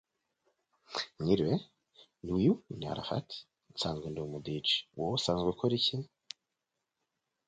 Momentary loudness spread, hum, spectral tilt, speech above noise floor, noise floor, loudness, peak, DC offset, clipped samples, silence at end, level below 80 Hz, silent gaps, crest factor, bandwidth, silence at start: 17 LU; none; -5.5 dB/octave; 54 dB; -87 dBFS; -33 LUFS; -14 dBFS; under 0.1%; under 0.1%; 1.4 s; -60 dBFS; none; 22 dB; 9.4 kHz; 0.9 s